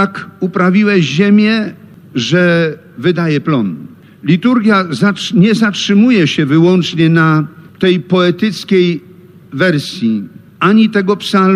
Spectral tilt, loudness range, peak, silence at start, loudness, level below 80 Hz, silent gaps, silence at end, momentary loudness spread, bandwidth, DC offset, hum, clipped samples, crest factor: -6.5 dB/octave; 3 LU; 0 dBFS; 0 s; -12 LUFS; -58 dBFS; none; 0 s; 10 LU; 11.5 kHz; under 0.1%; none; under 0.1%; 12 dB